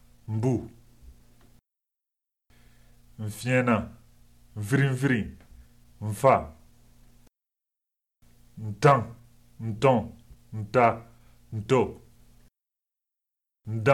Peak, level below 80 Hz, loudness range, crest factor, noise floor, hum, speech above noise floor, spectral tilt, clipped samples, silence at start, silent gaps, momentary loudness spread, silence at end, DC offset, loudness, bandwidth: -6 dBFS; -56 dBFS; 6 LU; 22 dB; -89 dBFS; none; 65 dB; -7 dB/octave; under 0.1%; 0.3 s; none; 19 LU; 0 s; 0.1%; -26 LUFS; 14.5 kHz